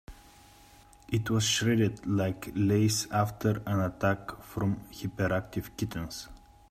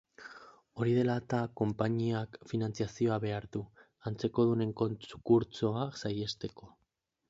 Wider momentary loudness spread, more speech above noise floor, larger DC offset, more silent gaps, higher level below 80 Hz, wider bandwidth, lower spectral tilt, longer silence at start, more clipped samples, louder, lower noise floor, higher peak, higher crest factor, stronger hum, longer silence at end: second, 12 LU vs 15 LU; second, 27 dB vs 48 dB; neither; neither; first, -54 dBFS vs -64 dBFS; first, 15.5 kHz vs 7.8 kHz; second, -5 dB/octave vs -7.5 dB/octave; about the same, 0.1 s vs 0.2 s; neither; first, -30 LUFS vs -33 LUFS; second, -56 dBFS vs -81 dBFS; about the same, -14 dBFS vs -14 dBFS; about the same, 16 dB vs 20 dB; neither; second, 0.35 s vs 0.6 s